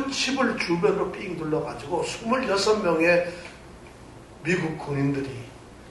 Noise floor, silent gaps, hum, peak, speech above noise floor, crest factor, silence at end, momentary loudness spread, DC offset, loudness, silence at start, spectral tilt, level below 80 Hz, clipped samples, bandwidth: -45 dBFS; none; none; -8 dBFS; 20 dB; 16 dB; 0 s; 23 LU; under 0.1%; -25 LUFS; 0 s; -5 dB/octave; -52 dBFS; under 0.1%; 11.5 kHz